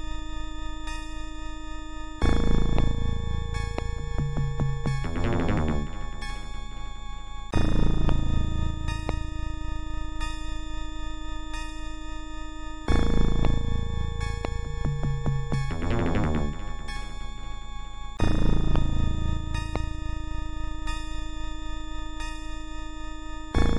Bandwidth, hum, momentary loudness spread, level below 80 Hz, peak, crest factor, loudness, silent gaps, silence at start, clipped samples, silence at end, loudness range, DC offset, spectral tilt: 10.5 kHz; none; 13 LU; -28 dBFS; -8 dBFS; 18 dB; -31 LUFS; none; 0 s; under 0.1%; 0 s; 6 LU; 2%; -6.5 dB/octave